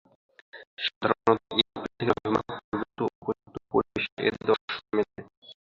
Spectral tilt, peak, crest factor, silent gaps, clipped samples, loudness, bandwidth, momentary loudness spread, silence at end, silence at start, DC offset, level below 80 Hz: -6.5 dB/octave; -4 dBFS; 26 dB; 0.67-0.77 s, 0.96-1.01 s, 2.64-2.72 s, 3.15-3.22 s, 4.12-4.17 s, 4.61-4.68 s, 5.37-5.42 s; under 0.1%; -28 LUFS; 7.4 kHz; 11 LU; 0.1 s; 0.55 s; under 0.1%; -60 dBFS